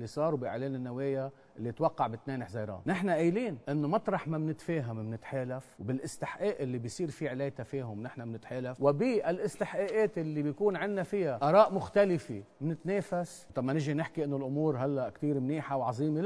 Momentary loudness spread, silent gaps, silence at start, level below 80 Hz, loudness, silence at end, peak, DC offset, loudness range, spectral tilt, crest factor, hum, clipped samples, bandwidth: 11 LU; none; 0 s; -68 dBFS; -33 LUFS; 0 s; -10 dBFS; under 0.1%; 7 LU; -7.5 dB/octave; 22 dB; none; under 0.1%; 11 kHz